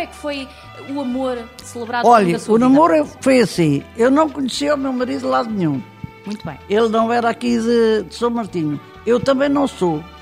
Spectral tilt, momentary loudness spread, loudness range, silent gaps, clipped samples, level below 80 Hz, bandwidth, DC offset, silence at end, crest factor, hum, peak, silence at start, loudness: -6 dB/octave; 16 LU; 4 LU; none; under 0.1%; -48 dBFS; 15 kHz; under 0.1%; 0 s; 18 dB; none; 0 dBFS; 0 s; -17 LUFS